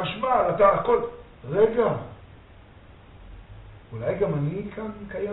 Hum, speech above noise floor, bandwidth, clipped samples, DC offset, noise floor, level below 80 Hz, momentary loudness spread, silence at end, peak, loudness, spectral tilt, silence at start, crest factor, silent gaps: none; 25 dB; 4.1 kHz; under 0.1%; under 0.1%; -49 dBFS; -50 dBFS; 16 LU; 0 s; -4 dBFS; -24 LUFS; -5.5 dB/octave; 0 s; 20 dB; none